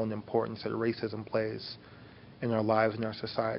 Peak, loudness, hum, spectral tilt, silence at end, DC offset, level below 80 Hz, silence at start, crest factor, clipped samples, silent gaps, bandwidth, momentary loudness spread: -14 dBFS; -32 LUFS; none; -9.5 dB/octave; 0 s; under 0.1%; -66 dBFS; 0 s; 18 dB; under 0.1%; none; 5.8 kHz; 19 LU